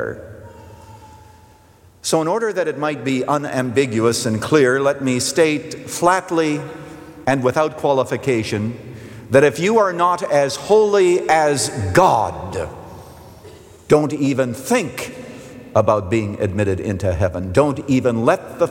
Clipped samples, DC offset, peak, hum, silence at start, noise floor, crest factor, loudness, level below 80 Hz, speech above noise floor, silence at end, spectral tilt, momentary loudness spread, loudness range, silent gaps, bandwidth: under 0.1%; under 0.1%; -2 dBFS; none; 0 s; -49 dBFS; 16 dB; -18 LUFS; -50 dBFS; 31 dB; 0 s; -5 dB/octave; 13 LU; 5 LU; none; 17 kHz